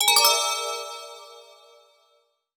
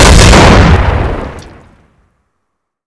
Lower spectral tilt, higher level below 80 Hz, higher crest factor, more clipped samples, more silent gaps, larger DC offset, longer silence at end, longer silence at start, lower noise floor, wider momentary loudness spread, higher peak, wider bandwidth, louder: second, 3.5 dB/octave vs -4.5 dB/octave; second, -78 dBFS vs -12 dBFS; first, 24 dB vs 8 dB; second, under 0.1% vs 10%; neither; neither; second, 1.15 s vs 1.45 s; about the same, 0 s vs 0 s; about the same, -67 dBFS vs -69 dBFS; first, 24 LU vs 18 LU; about the same, -2 dBFS vs 0 dBFS; first, over 20 kHz vs 11 kHz; second, -20 LUFS vs -5 LUFS